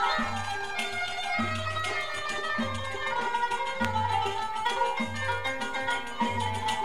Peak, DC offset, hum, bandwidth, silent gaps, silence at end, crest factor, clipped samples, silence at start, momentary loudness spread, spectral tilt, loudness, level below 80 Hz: -10 dBFS; 1%; none; 16 kHz; none; 0 s; 20 dB; under 0.1%; 0 s; 3 LU; -3.5 dB/octave; -30 LUFS; -54 dBFS